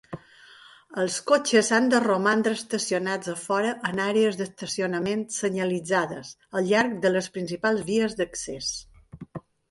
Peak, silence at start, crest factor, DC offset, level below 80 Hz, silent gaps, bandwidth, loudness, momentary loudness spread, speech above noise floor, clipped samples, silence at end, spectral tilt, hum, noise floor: -6 dBFS; 0.1 s; 18 dB; under 0.1%; -62 dBFS; none; 11.5 kHz; -25 LUFS; 13 LU; 26 dB; under 0.1%; 0.3 s; -4 dB/octave; none; -51 dBFS